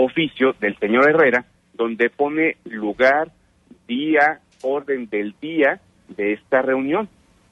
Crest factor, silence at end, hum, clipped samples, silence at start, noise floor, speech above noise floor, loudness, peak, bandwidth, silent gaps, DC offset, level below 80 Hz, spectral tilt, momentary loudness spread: 16 dB; 0.45 s; none; under 0.1%; 0 s; -52 dBFS; 33 dB; -20 LUFS; -4 dBFS; 8 kHz; none; under 0.1%; -62 dBFS; -6.5 dB/octave; 11 LU